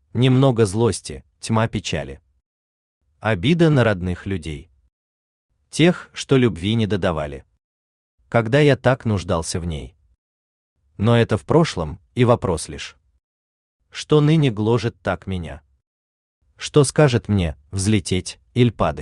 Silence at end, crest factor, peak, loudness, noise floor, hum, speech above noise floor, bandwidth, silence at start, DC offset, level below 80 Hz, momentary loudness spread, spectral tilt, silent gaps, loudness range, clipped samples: 0 s; 18 dB; -2 dBFS; -19 LUFS; under -90 dBFS; none; over 71 dB; 11 kHz; 0.15 s; under 0.1%; -44 dBFS; 15 LU; -6 dB/octave; 2.46-3.01 s, 4.92-5.49 s, 7.64-8.18 s, 10.18-10.76 s, 13.24-13.79 s, 15.87-16.41 s; 2 LU; under 0.1%